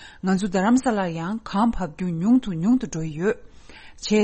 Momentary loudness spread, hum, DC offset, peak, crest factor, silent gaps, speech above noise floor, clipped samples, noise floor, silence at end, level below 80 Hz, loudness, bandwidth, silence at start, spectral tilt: 9 LU; none; under 0.1%; -8 dBFS; 14 dB; none; 22 dB; under 0.1%; -44 dBFS; 0 s; -44 dBFS; -23 LUFS; 8.8 kHz; 0 s; -6 dB/octave